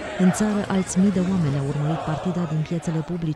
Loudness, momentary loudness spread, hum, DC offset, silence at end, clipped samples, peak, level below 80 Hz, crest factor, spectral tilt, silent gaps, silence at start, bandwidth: -23 LUFS; 6 LU; none; under 0.1%; 0 s; under 0.1%; -8 dBFS; -48 dBFS; 14 dB; -6.5 dB/octave; none; 0 s; 12 kHz